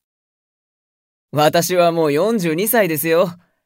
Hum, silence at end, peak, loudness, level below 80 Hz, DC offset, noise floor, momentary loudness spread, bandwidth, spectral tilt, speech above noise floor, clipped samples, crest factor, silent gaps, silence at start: none; 0.3 s; -2 dBFS; -16 LUFS; -68 dBFS; under 0.1%; under -90 dBFS; 3 LU; 16.5 kHz; -4.5 dB/octave; over 74 dB; under 0.1%; 16 dB; none; 1.35 s